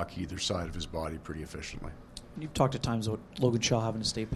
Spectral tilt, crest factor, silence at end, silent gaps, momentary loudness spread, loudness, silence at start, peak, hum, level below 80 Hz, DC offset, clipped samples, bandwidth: -5 dB/octave; 22 dB; 0 s; none; 14 LU; -32 LUFS; 0 s; -10 dBFS; none; -48 dBFS; under 0.1%; under 0.1%; 13 kHz